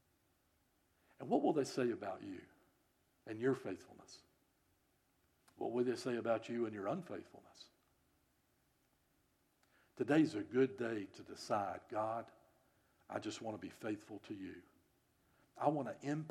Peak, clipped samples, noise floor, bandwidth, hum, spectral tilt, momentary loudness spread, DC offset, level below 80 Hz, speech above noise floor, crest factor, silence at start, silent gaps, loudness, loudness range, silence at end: -20 dBFS; under 0.1%; -78 dBFS; 14 kHz; none; -6 dB/octave; 22 LU; under 0.1%; -86 dBFS; 38 dB; 22 dB; 1.2 s; none; -40 LUFS; 8 LU; 0 s